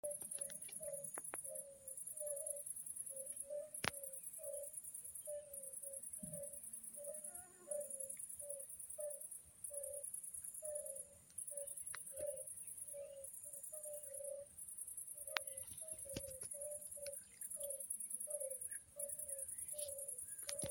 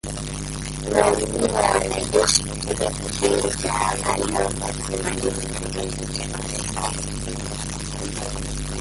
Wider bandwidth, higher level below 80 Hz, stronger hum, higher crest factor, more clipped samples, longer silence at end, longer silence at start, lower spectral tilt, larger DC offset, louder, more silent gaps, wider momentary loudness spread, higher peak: first, 17 kHz vs 12 kHz; second, -78 dBFS vs -36 dBFS; second, none vs 50 Hz at -35 dBFS; first, 36 dB vs 22 dB; neither; about the same, 0 s vs 0 s; about the same, 0.05 s vs 0.05 s; second, -1 dB/octave vs -3.5 dB/octave; neither; second, -47 LUFS vs -23 LUFS; neither; second, 6 LU vs 10 LU; second, -14 dBFS vs -2 dBFS